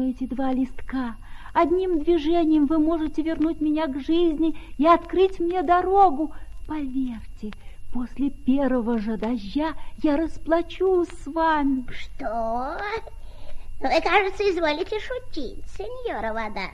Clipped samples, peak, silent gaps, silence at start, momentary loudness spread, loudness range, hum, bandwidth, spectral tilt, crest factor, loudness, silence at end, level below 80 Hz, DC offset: under 0.1%; -6 dBFS; none; 0 s; 14 LU; 5 LU; none; 10.5 kHz; -6 dB/octave; 18 dB; -24 LUFS; 0.05 s; -40 dBFS; under 0.1%